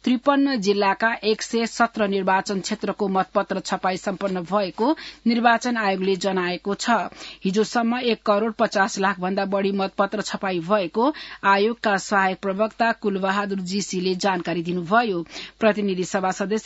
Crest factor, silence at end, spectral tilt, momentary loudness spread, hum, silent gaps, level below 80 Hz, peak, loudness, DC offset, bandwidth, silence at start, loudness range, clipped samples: 18 dB; 0 s; -4.5 dB/octave; 6 LU; none; none; -60 dBFS; -4 dBFS; -22 LUFS; under 0.1%; 8 kHz; 0.05 s; 2 LU; under 0.1%